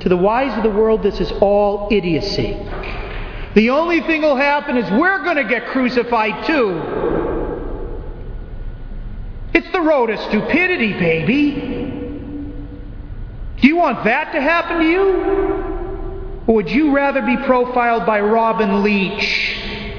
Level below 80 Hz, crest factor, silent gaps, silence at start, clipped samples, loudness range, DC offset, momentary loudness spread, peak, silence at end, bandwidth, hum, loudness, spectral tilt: -32 dBFS; 16 dB; none; 0 s; under 0.1%; 4 LU; under 0.1%; 18 LU; 0 dBFS; 0 s; 5.4 kHz; none; -16 LUFS; -7 dB/octave